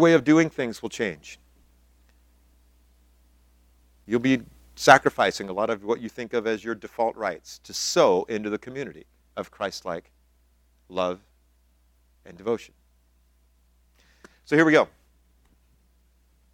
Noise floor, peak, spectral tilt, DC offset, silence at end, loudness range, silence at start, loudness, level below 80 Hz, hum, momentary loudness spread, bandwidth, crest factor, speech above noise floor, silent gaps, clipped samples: -63 dBFS; 0 dBFS; -4.5 dB/octave; under 0.1%; 1.65 s; 12 LU; 0 s; -24 LUFS; -60 dBFS; none; 18 LU; 16 kHz; 26 dB; 39 dB; none; under 0.1%